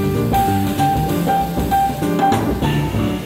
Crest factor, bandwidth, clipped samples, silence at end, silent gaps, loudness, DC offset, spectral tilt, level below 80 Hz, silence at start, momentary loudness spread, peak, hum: 14 dB; 16.5 kHz; under 0.1%; 0 s; none; -17 LUFS; under 0.1%; -6.5 dB/octave; -30 dBFS; 0 s; 2 LU; -4 dBFS; none